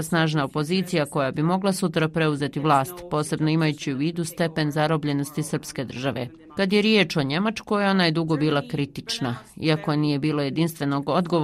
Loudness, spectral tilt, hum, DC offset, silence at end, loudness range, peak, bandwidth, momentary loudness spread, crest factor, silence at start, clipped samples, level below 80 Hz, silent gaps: -24 LUFS; -5.5 dB/octave; none; under 0.1%; 0 s; 2 LU; -6 dBFS; 15 kHz; 8 LU; 18 dB; 0 s; under 0.1%; -58 dBFS; none